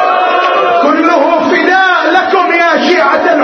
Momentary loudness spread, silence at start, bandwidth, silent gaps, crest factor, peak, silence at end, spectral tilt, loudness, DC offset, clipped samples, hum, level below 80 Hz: 2 LU; 0 s; 6.6 kHz; none; 8 dB; 0 dBFS; 0 s; -3.5 dB/octave; -8 LUFS; under 0.1%; 0.2%; none; -58 dBFS